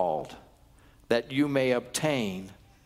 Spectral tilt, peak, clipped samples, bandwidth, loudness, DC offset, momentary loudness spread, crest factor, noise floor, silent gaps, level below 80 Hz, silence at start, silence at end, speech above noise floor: -5 dB/octave; -10 dBFS; under 0.1%; 16 kHz; -28 LUFS; under 0.1%; 15 LU; 20 dB; -57 dBFS; none; -60 dBFS; 0 s; 0.35 s; 30 dB